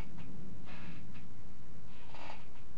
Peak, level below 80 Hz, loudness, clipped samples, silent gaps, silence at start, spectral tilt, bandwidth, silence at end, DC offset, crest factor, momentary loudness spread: -24 dBFS; -60 dBFS; -52 LUFS; under 0.1%; none; 0 s; -6.5 dB/octave; 13 kHz; 0 s; 4%; 18 dB; 6 LU